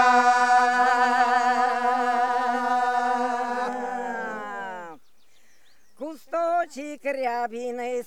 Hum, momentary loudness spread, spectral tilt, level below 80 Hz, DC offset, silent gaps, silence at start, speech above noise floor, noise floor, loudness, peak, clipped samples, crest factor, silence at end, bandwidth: none; 15 LU; -2 dB/octave; -76 dBFS; 0.4%; none; 0 s; 35 dB; -64 dBFS; -23 LUFS; -6 dBFS; under 0.1%; 18 dB; 0 s; 13 kHz